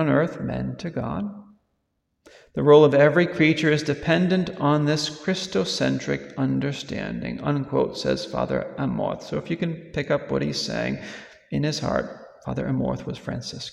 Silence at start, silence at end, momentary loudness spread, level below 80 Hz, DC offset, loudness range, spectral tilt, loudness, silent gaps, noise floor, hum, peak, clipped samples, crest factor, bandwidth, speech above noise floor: 0 s; 0 s; 13 LU; -52 dBFS; under 0.1%; 8 LU; -6 dB/octave; -23 LUFS; none; -75 dBFS; none; -4 dBFS; under 0.1%; 20 dB; 12 kHz; 52 dB